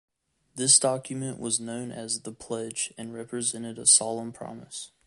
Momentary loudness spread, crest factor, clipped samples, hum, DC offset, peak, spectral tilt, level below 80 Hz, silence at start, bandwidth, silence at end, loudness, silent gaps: 20 LU; 24 dB; under 0.1%; none; under 0.1%; -6 dBFS; -2 dB/octave; -70 dBFS; 0.55 s; 11.5 kHz; 0.2 s; -25 LUFS; none